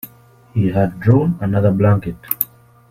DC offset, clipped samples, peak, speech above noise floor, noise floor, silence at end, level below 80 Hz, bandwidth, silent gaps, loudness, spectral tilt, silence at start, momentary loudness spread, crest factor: under 0.1%; under 0.1%; 0 dBFS; 28 dB; -44 dBFS; 0.45 s; -44 dBFS; 16.5 kHz; none; -17 LUFS; -9 dB/octave; 0.05 s; 9 LU; 18 dB